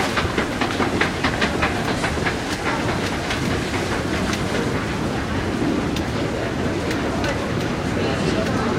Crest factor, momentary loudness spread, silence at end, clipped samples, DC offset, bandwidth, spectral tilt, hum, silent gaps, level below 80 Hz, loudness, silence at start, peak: 18 dB; 3 LU; 0 s; under 0.1%; under 0.1%; 16 kHz; -5 dB/octave; none; none; -36 dBFS; -22 LUFS; 0 s; -4 dBFS